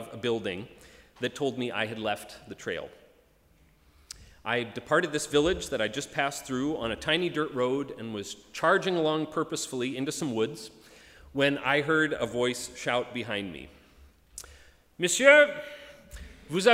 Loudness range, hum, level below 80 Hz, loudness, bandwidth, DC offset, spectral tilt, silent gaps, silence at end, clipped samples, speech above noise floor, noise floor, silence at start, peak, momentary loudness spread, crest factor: 9 LU; none; -56 dBFS; -28 LUFS; 16 kHz; under 0.1%; -3.5 dB/octave; none; 0 s; under 0.1%; 34 dB; -62 dBFS; 0 s; -4 dBFS; 21 LU; 26 dB